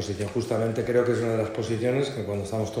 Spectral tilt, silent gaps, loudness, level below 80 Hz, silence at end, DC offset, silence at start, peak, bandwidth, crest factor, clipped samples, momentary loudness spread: -6.5 dB/octave; none; -27 LUFS; -56 dBFS; 0 s; under 0.1%; 0 s; -10 dBFS; 15.5 kHz; 16 dB; under 0.1%; 6 LU